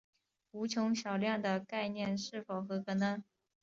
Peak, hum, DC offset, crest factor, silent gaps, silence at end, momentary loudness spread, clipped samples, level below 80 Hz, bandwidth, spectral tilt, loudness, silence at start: -20 dBFS; none; under 0.1%; 18 dB; none; 0.4 s; 7 LU; under 0.1%; -78 dBFS; 7.6 kHz; -4.5 dB/octave; -37 LUFS; 0.55 s